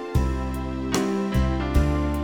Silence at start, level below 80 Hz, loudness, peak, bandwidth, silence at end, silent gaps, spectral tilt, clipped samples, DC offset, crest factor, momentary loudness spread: 0 s; -26 dBFS; -25 LUFS; -6 dBFS; 19 kHz; 0 s; none; -6.5 dB/octave; under 0.1%; 0.1%; 16 dB; 6 LU